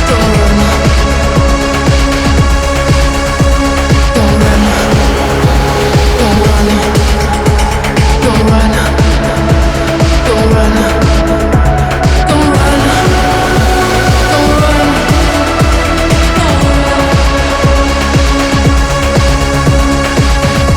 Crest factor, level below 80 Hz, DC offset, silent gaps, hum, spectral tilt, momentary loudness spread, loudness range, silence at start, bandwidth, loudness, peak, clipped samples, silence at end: 8 dB; -14 dBFS; under 0.1%; none; none; -5.5 dB/octave; 2 LU; 1 LU; 0 s; 17 kHz; -9 LUFS; 0 dBFS; under 0.1%; 0 s